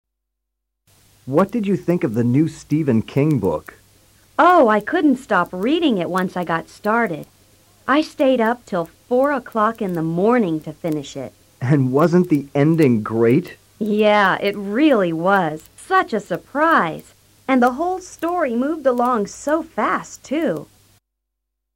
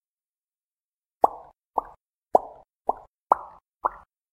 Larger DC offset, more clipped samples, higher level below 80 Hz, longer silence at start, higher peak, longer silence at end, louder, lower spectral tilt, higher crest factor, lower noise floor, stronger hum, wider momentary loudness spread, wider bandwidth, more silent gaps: neither; neither; first, -56 dBFS vs -62 dBFS; about the same, 1.25 s vs 1.25 s; about the same, -4 dBFS vs -2 dBFS; first, 1.1 s vs 0.45 s; first, -18 LUFS vs -27 LUFS; about the same, -7 dB/octave vs -7 dB/octave; second, 16 dB vs 28 dB; second, -78 dBFS vs under -90 dBFS; neither; second, 10 LU vs 18 LU; about the same, 16.5 kHz vs 15 kHz; second, none vs 2.05-2.22 s, 2.76-2.80 s, 3.08-3.26 s, 3.68-3.80 s